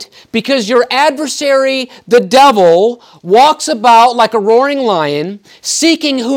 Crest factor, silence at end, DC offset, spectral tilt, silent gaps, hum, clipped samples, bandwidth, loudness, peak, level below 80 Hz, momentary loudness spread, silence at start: 10 dB; 0 s; under 0.1%; -3 dB/octave; none; none; under 0.1%; 17.5 kHz; -10 LUFS; 0 dBFS; -58 dBFS; 11 LU; 0 s